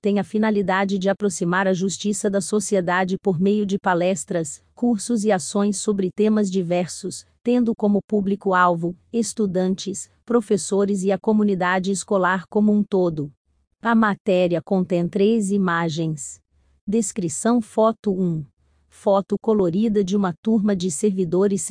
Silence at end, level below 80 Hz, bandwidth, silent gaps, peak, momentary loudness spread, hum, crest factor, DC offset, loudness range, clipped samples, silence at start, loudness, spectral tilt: 0 s; -58 dBFS; 10.5 kHz; 8.04-8.08 s, 13.37-13.45 s, 14.20-14.25 s, 16.81-16.87 s, 17.99-18.03 s, 20.38-20.43 s; -4 dBFS; 7 LU; none; 16 dB; under 0.1%; 2 LU; under 0.1%; 0 s; -21 LUFS; -5.5 dB/octave